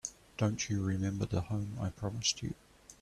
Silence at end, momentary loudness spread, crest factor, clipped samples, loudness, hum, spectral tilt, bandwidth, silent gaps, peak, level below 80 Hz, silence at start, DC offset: 0.1 s; 9 LU; 18 dB; under 0.1%; -35 LUFS; none; -4.5 dB/octave; 13 kHz; none; -16 dBFS; -58 dBFS; 0.05 s; under 0.1%